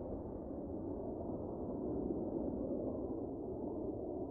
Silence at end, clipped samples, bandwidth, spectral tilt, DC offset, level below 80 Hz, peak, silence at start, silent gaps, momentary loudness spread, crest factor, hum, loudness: 0 s; under 0.1%; 1.9 kHz; -11.5 dB/octave; under 0.1%; -56 dBFS; -28 dBFS; 0 s; none; 5 LU; 14 dB; none; -42 LUFS